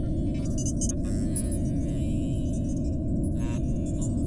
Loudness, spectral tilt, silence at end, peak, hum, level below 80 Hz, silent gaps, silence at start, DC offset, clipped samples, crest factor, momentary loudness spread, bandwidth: -29 LUFS; -7 dB/octave; 0 s; -14 dBFS; none; -32 dBFS; none; 0 s; under 0.1%; under 0.1%; 12 dB; 1 LU; 11.5 kHz